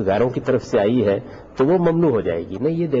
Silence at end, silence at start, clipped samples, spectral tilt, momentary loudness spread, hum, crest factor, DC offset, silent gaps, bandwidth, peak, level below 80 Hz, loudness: 0 s; 0 s; under 0.1%; -8 dB/octave; 7 LU; none; 12 dB; under 0.1%; none; 7.6 kHz; -8 dBFS; -48 dBFS; -19 LUFS